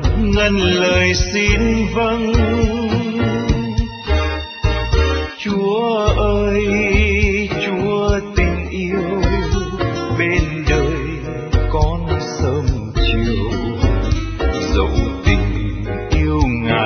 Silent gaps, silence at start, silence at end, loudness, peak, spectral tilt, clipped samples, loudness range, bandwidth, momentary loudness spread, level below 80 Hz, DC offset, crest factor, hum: none; 0 s; 0 s; -17 LUFS; 0 dBFS; -6 dB/octave; under 0.1%; 3 LU; 6.6 kHz; 6 LU; -22 dBFS; under 0.1%; 16 dB; none